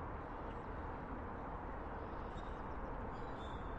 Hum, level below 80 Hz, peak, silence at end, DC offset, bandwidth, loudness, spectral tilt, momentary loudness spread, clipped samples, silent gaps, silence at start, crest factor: none; -52 dBFS; -32 dBFS; 0 s; under 0.1%; 8.2 kHz; -47 LUFS; -8 dB/octave; 1 LU; under 0.1%; none; 0 s; 12 dB